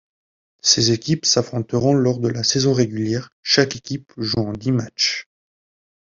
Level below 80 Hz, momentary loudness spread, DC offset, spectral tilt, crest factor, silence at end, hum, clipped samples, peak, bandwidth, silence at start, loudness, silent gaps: -54 dBFS; 9 LU; under 0.1%; -4 dB/octave; 20 dB; 0.8 s; none; under 0.1%; -2 dBFS; 7.6 kHz; 0.65 s; -19 LUFS; 3.32-3.43 s